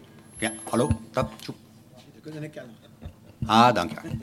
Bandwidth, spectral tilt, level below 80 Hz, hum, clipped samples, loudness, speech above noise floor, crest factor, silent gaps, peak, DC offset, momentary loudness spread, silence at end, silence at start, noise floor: 16 kHz; -5 dB/octave; -48 dBFS; none; under 0.1%; -24 LUFS; 25 dB; 24 dB; none; -2 dBFS; under 0.1%; 27 LU; 0 s; 0.35 s; -51 dBFS